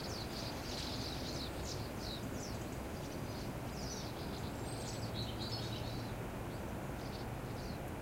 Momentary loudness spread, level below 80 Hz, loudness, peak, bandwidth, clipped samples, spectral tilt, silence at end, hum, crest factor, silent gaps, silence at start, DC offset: 3 LU; -52 dBFS; -43 LUFS; -28 dBFS; 16 kHz; under 0.1%; -4.5 dB/octave; 0 s; none; 16 dB; none; 0 s; under 0.1%